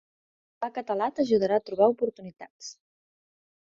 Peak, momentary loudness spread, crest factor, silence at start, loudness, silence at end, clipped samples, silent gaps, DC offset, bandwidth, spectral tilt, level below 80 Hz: -8 dBFS; 20 LU; 20 dB; 0.6 s; -26 LUFS; 0.9 s; under 0.1%; 2.50-2.59 s; under 0.1%; 7.6 kHz; -5.5 dB/octave; -72 dBFS